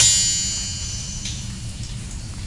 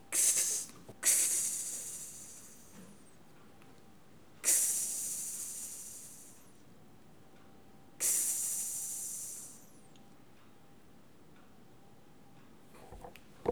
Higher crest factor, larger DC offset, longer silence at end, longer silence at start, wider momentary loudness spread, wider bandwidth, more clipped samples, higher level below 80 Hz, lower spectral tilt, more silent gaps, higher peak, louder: about the same, 22 dB vs 26 dB; second, under 0.1% vs 0.1%; about the same, 0 s vs 0 s; about the same, 0 s vs 0.1 s; second, 16 LU vs 26 LU; second, 12 kHz vs over 20 kHz; neither; first, -36 dBFS vs -70 dBFS; about the same, -1 dB/octave vs 0 dB/octave; neither; first, -2 dBFS vs -14 dBFS; first, -22 LUFS vs -32 LUFS